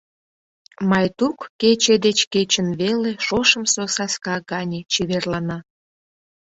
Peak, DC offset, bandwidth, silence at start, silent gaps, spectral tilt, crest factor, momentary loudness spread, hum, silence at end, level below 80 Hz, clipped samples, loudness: -2 dBFS; under 0.1%; 8.2 kHz; 0.8 s; 1.50-1.59 s, 2.27-2.31 s; -3.5 dB/octave; 20 dB; 10 LU; none; 0.85 s; -54 dBFS; under 0.1%; -19 LUFS